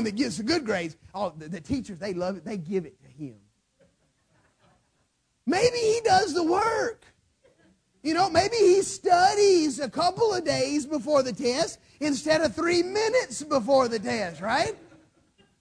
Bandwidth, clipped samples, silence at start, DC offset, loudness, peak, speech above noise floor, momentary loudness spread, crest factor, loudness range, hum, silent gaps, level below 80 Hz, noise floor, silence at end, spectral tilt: 10.5 kHz; under 0.1%; 0 s; under 0.1%; -25 LUFS; -8 dBFS; 47 dB; 13 LU; 18 dB; 12 LU; none; none; -58 dBFS; -72 dBFS; 0.85 s; -4 dB/octave